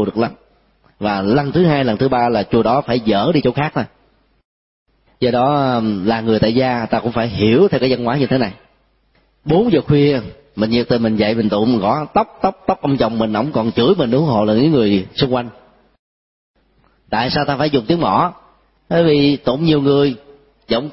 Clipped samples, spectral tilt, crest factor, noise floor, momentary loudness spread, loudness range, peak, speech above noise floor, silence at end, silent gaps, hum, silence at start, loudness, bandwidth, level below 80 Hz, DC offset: under 0.1%; -11 dB/octave; 14 dB; -58 dBFS; 7 LU; 3 LU; -2 dBFS; 43 dB; 0 s; 4.45-4.86 s, 15.99-16.54 s; none; 0 s; -16 LUFS; 5.8 kHz; -44 dBFS; under 0.1%